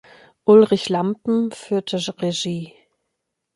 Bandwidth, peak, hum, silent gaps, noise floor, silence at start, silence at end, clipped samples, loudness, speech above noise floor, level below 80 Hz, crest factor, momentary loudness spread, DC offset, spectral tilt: 11.5 kHz; -2 dBFS; none; none; -78 dBFS; 0.45 s; 0.9 s; under 0.1%; -19 LUFS; 59 dB; -64 dBFS; 18 dB; 13 LU; under 0.1%; -5.5 dB/octave